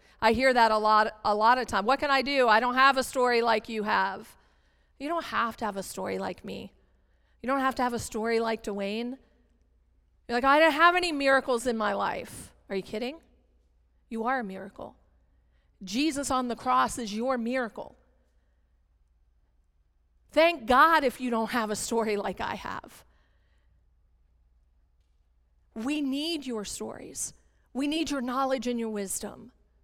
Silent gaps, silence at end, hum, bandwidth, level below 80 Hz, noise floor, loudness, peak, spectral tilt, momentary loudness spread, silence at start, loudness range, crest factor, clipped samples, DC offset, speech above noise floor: none; 0.35 s; none; 18 kHz; -56 dBFS; -67 dBFS; -27 LUFS; -8 dBFS; -3 dB/octave; 17 LU; 0.2 s; 12 LU; 20 dB; under 0.1%; under 0.1%; 40 dB